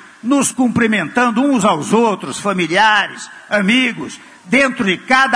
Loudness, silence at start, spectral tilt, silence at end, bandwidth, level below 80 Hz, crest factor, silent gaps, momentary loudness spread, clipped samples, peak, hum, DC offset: -14 LUFS; 0.25 s; -4 dB/octave; 0 s; 11 kHz; -54 dBFS; 14 dB; none; 8 LU; under 0.1%; 0 dBFS; none; under 0.1%